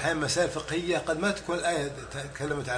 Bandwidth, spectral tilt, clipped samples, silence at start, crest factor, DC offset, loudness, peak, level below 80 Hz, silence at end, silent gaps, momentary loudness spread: 10.5 kHz; -4 dB/octave; under 0.1%; 0 s; 18 dB; under 0.1%; -29 LUFS; -12 dBFS; -52 dBFS; 0 s; none; 8 LU